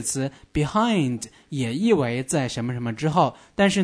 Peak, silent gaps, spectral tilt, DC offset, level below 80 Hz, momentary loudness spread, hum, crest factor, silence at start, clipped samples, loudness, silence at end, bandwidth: -6 dBFS; none; -5 dB/octave; under 0.1%; -48 dBFS; 7 LU; none; 18 dB; 0 s; under 0.1%; -24 LUFS; 0 s; 11 kHz